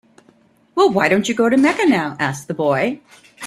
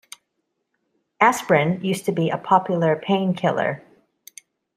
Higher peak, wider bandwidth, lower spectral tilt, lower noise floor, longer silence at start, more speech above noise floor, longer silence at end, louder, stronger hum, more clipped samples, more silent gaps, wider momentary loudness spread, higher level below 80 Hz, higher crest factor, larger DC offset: about the same, -2 dBFS vs -2 dBFS; second, 13.5 kHz vs 15.5 kHz; about the same, -5 dB/octave vs -6 dB/octave; second, -54 dBFS vs -76 dBFS; second, 0.75 s vs 1.2 s; second, 37 dB vs 56 dB; second, 0 s vs 1 s; first, -17 LUFS vs -20 LUFS; neither; neither; neither; first, 9 LU vs 6 LU; first, -58 dBFS vs -66 dBFS; second, 16 dB vs 22 dB; neither